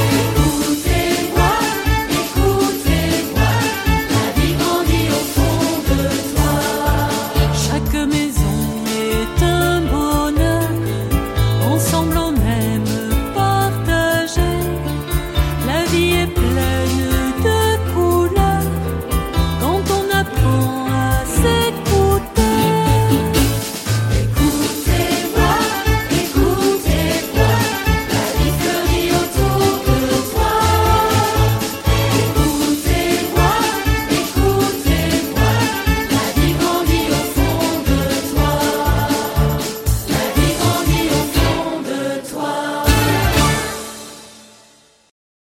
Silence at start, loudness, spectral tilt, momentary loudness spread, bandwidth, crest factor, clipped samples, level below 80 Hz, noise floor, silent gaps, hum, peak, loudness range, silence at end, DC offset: 0 s; -17 LUFS; -5 dB/octave; 4 LU; 17 kHz; 16 dB; under 0.1%; -24 dBFS; -50 dBFS; none; none; -2 dBFS; 2 LU; 1.1 s; under 0.1%